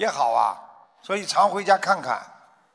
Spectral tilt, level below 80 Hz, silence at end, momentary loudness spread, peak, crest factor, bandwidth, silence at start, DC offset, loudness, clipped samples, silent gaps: -2.5 dB/octave; -80 dBFS; 0.45 s; 10 LU; -6 dBFS; 18 dB; 11 kHz; 0 s; under 0.1%; -22 LUFS; under 0.1%; none